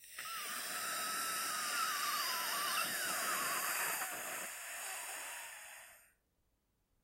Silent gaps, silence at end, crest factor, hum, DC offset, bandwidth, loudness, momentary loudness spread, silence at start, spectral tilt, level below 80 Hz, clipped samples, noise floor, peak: none; 1 s; 18 dB; none; under 0.1%; 16 kHz; -38 LUFS; 10 LU; 0 s; 1 dB/octave; -82 dBFS; under 0.1%; -80 dBFS; -24 dBFS